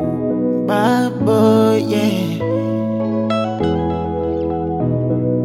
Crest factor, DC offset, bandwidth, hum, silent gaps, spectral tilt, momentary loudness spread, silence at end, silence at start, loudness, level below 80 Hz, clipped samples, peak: 14 dB; under 0.1%; 15.5 kHz; none; none; -7.5 dB/octave; 7 LU; 0 s; 0 s; -17 LUFS; -40 dBFS; under 0.1%; -2 dBFS